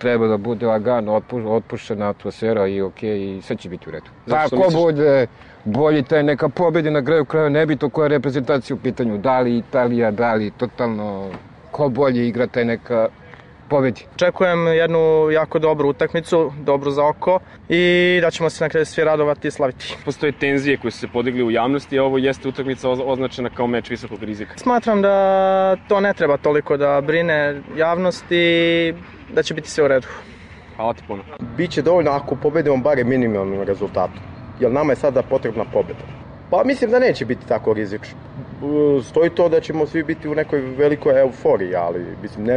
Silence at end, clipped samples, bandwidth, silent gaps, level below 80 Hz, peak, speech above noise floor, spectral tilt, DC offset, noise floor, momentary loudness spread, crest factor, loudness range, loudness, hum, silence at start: 0 s; under 0.1%; 10 kHz; none; -50 dBFS; -6 dBFS; 24 dB; -6.5 dB/octave; under 0.1%; -42 dBFS; 12 LU; 12 dB; 4 LU; -19 LUFS; none; 0 s